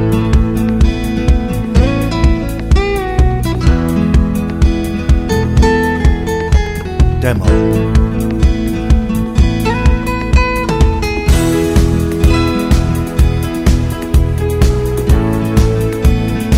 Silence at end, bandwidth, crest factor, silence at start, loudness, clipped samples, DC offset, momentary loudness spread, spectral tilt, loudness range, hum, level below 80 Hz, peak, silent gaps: 0 s; 16 kHz; 12 dB; 0 s; -13 LUFS; under 0.1%; 0.1%; 3 LU; -7 dB/octave; 1 LU; none; -14 dBFS; 0 dBFS; none